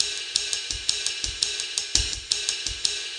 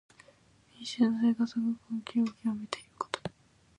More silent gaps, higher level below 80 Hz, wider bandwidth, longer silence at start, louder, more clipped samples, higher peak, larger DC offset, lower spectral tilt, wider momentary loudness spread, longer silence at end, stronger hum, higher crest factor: neither; first, -42 dBFS vs -70 dBFS; first, 14.5 kHz vs 10 kHz; second, 0 s vs 0.8 s; first, -25 LUFS vs -32 LUFS; neither; first, 0 dBFS vs -12 dBFS; neither; second, 0.5 dB/octave vs -5 dB/octave; second, 3 LU vs 13 LU; second, 0 s vs 0.5 s; neither; about the same, 26 dB vs 22 dB